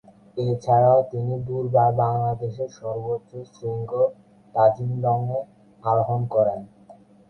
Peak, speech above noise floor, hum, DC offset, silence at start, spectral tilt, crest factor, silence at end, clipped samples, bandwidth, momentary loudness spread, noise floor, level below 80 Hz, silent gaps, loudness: -4 dBFS; 28 dB; none; under 0.1%; 0.35 s; -9.5 dB/octave; 18 dB; 0.35 s; under 0.1%; 6.6 kHz; 13 LU; -50 dBFS; -58 dBFS; none; -23 LUFS